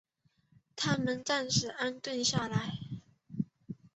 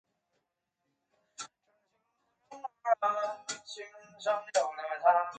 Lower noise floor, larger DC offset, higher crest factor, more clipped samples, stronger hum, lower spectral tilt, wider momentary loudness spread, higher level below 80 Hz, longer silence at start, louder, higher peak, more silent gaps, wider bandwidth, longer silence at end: second, -71 dBFS vs -84 dBFS; neither; about the same, 20 dB vs 24 dB; neither; neither; first, -3.5 dB/octave vs -0.5 dB/octave; about the same, 17 LU vs 18 LU; first, -66 dBFS vs -88 dBFS; second, 0.75 s vs 1.4 s; about the same, -33 LUFS vs -32 LUFS; second, -16 dBFS vs -12 dBFS; neither; second, 8.2 kHz vs 9.4 kHz; first, 0.2 s vs 0 s